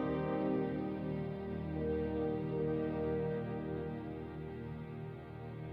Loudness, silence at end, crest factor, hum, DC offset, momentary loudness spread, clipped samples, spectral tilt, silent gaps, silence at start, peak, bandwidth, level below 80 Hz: -39 LUFS; 0 s; 14 dB; none; under 0.1%; 10 LU; under 0.1%; -10.5 dB/octave; none; 0 s; -24 dBFS; 5.4 kHz; -54 dBFS